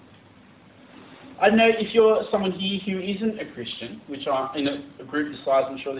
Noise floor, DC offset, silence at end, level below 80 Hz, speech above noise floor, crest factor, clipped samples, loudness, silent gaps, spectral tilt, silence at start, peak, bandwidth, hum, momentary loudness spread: -51 dBFS; under 0.1%; 0 s; -60 dBFS; 28 dB; 20 dB; under 0.1%; -23 LUFS; none; -9.5 dB/octave; 1 s; -4 dBFS; 4 kHz; none; 14 LU